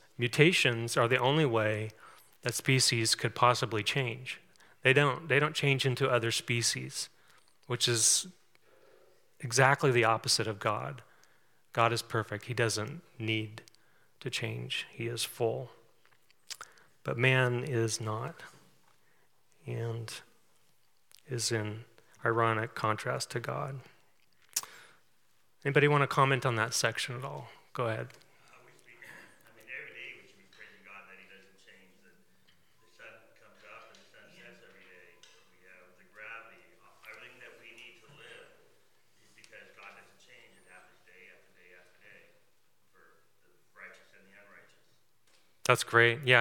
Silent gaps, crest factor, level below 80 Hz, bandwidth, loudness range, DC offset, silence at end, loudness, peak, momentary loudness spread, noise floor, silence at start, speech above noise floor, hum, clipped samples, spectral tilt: none; 28 dB; -80 dBFS; 18 kHz; 22 LU; under 0.1%; 0 s; -30 LUFS; -6 dBFS; 26 LU; -74 dBFS; 0.2 s; 44 dB; none; under 0.1%; -3.5 dB/octave